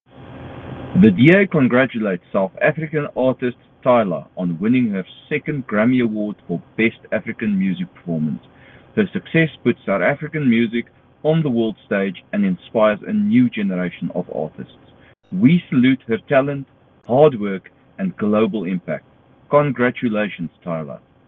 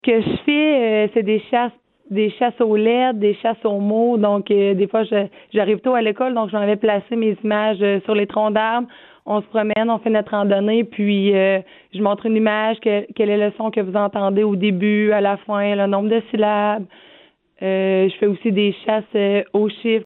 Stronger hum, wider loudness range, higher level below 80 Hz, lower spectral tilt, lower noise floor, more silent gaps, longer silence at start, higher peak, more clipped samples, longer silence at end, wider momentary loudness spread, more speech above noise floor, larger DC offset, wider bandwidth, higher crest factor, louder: neither; about the same, 4 LU vs 2 LU; first, -58 dBFS vs -64 dBFS; about the same, -10 dB/octave vs -10.5 dB/octave; about the same, -49 dBFS vs -51 dBFS; neither; first, 0.2 s vs 0.05 s; first, 0 dBFS vs -4 dBFS; neither; first, 0.3 s vs 0 s; first, 13 LU vs 5 LU; about the same, 31 dB vs 33 dB; neither; about the same, 4.1 kHz vs 4.1 kHz; about the same, 18 dB vs 14 dB; about the same, -19 LUFS vs -18 LUFS